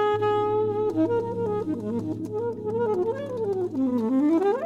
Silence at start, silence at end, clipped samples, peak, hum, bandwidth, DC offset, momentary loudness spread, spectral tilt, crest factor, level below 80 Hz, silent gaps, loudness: 0 s; 0 s; under 0.1%; -14 dBFS; none; 8.4 kHz; under 0.1%; 7 LU; -8.5 dB/octave; 12 dB; -60 dBFS; none; -26 LUFS